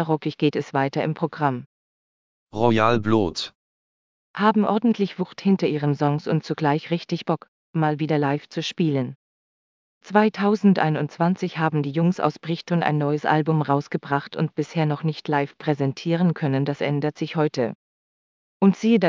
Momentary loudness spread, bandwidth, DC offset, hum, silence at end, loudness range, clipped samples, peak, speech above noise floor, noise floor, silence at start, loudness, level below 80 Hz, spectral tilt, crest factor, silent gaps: 7 LU; 7.6 kHz; under 0.1%; none; 0 s; 2 LU; under 0.1%; -2 dBFS; over 68 dB; under -90 dBFS; 0 s; -23 LUFS; -58 dBFS; -7.5 dB/octave; 20 dB; 1.66-2.47 s, 3.55-4.34 s, 7.48-7.73 s, 9.15-10.01 s, 17.75-18.60 s